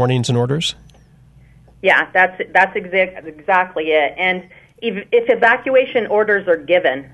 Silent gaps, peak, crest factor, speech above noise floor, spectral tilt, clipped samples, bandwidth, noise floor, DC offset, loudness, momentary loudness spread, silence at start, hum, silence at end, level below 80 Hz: none; -2 dBFS; 16 dB; 31 dB; -5 dB/octave; under 0.1%; 11.5 kHz; -47 dBFS; under 0.1%; -16 LUFS; 8 LU; 0 s; none; 0.1 s; -54 dBFS